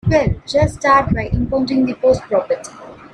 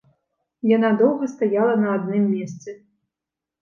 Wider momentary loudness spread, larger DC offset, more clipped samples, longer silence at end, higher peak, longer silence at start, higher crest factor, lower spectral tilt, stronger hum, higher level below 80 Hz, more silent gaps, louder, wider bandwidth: second, 7 LU vs 14 LU; neither; neither; second, 0.05 s vs 0.85 s; first, 0 dBFS vs -6 dBFS; second, 0.05 s vs 0.65 s; about the same, 16 dB vs 16 dB; second, -6.5 dB/octave vs -8 dB/octave; neither; first, -32 dBFS vs -74 dBFS; neither; first, -17 LUFS vs -20 LUFS; first, 11 kHz vs 7.2 kHz